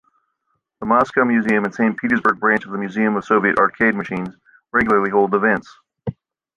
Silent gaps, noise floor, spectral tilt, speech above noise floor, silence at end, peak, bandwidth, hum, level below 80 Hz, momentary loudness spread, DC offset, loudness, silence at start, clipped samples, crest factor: none; -72 dBFS; -7.5 dB/octave; 54 dB; 0.45 s; -2 dBFS; 7.4 kHz; none; -54 dBFS; 14 LU; under 0.1%; -18 LUFS; 0.8 s; under 0.1%; 16 dB